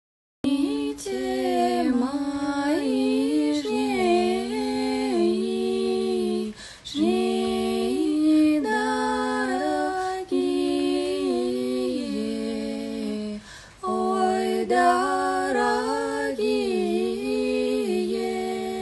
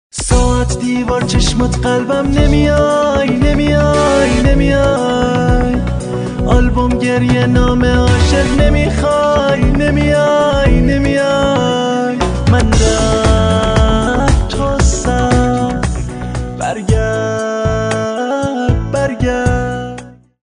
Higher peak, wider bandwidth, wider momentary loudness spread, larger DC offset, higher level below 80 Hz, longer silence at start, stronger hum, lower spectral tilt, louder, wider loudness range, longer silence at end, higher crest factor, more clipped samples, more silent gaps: second, -8 dBFS vs 0 dBFS; first, 12.5 kHz vs 10.5 kHz; about the same, 8 LU vs 6 LU; neither; second, -56 dBFS vs -18 dBFS; first, 0.45 s vs 0.15 s; neither; second, -4.5 dB/octave vs -6 dB/octave; second, -25 LUFS vs -13 LUFS; about the same, 3 LU vs 4 LU; second, 0 s vs 0.35 s; about the same, 16 dB vs 12 dB; neither; neither